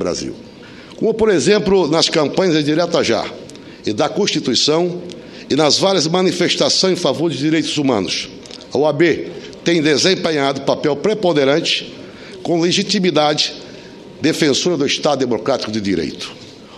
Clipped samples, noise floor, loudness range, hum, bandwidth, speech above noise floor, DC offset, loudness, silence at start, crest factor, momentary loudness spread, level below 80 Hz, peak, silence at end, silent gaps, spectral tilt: under 0.1%; -36 dBFS; 2 LU; none; 12.5 kHz; 20 dB; under 0.1%; -16 LUFS; 0 s; 16 dB; 16 LU; -52 dBFS; 0 dBFS; 0 s; none; -4 dB/octave